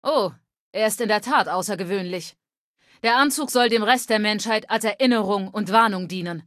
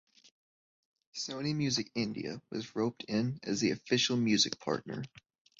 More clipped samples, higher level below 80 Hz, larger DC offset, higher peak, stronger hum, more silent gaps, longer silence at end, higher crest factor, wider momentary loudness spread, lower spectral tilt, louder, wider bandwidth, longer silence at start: neither; about the same, -72 dBFS vs -70 dBFS; neither; first, -2 dBFS vs -14 dBFS; neither; first, 0.59-0.73 s, 2.57-2.75 s vs none; second, 0.05 s vs 0.4 s; about the same, 20 dB vs 20 dB; second, 10 LU vs 13 LU; about the same, -3.5 dB/octave vs -4 dB/octave; first, -21 LUFS vs -33 LUFS; first, 14.5 kHz vs 8 kHz; second, 0.05 s vs 1.15 s